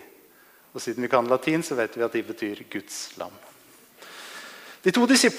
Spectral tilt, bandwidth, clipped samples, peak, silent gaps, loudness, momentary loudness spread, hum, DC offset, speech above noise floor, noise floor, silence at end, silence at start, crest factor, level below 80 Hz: -3.5 dB/octave; 15.5 kHz; under 0.1%; -6 dBFS; none; -25 LUFS; 19 LU; none; under 0.1%; 31 dB; -55 dBFS; 0 s; 0 s; 20 dB; -74 dBFS